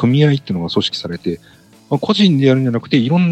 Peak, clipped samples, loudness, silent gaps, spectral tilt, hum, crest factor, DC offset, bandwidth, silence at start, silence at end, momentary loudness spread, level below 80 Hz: 0 dBFS; under 0.1%; -15 LUFS; none; -7 dB/octave; none; 14 dB; under 0.1%; 8.8 kHz; 0 s; 0 s; 11 LU; -54 dBFS